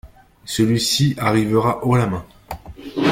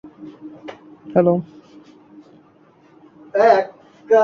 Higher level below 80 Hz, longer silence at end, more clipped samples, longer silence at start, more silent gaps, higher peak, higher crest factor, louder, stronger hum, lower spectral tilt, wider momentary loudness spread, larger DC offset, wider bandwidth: first, -46 dBFS vs -66 dBFS; about the same, 0 s vs 0 s; neither; about the same, 0.05 s vs 0.05 s; neither; about the same, -4 dBFS vs -2 dBFS; about the same, 16 dB vs 18 dB; about the same, -18 LUFS vs -18 LUFS; neither; second, -5 dB/octave vs -7.5 dB/octave; second, 18 LU vs 25 LU; neither; first, 16.5 kHz vs 7 kHz